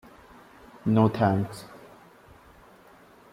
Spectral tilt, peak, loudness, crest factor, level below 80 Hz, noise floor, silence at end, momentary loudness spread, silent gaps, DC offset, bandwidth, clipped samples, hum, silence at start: -8.5 dB/octave; -10 dBFS; -25 LUFS; 20 dB; -62 dBFS; -54 dBFS; 1.55 s; 24 LU; none; under 0.1%; 14.5 kHz; under 0.1%; none; 0.85 s